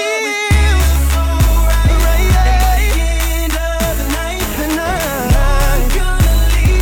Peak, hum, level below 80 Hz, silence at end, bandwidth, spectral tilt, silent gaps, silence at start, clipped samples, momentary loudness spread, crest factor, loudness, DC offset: -2 dBFS; none; -14 dBFS; 0 s; 18.5 kHz; -4.5 dB/octave; none; 0 s; under 0.1%; 5 LU; 10 dB; -14 LUFS; under 0.1%